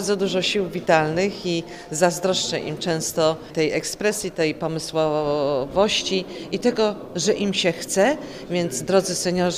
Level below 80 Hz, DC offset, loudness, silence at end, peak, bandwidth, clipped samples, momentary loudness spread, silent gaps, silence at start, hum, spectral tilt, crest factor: -52 dBFS; under 0.1%; -22 LUFS; 0 s; -4 dBFS; 16 kHz; under 0.1%; 6 LU; none; 0 s; none; -4 dB/octave; 18 dB